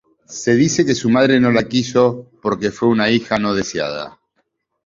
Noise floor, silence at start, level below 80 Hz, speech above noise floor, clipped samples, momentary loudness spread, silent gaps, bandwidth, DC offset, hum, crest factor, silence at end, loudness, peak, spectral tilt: -68 dBFS; 0.3 s; -52 dBFS; 52 dB; under 0.1%; 11 LU; none; 7.8 kHz; under 0.1%; none; 16 dB; 0.75 s; -16 LUFS; -2 dBFS; -5 dB/octave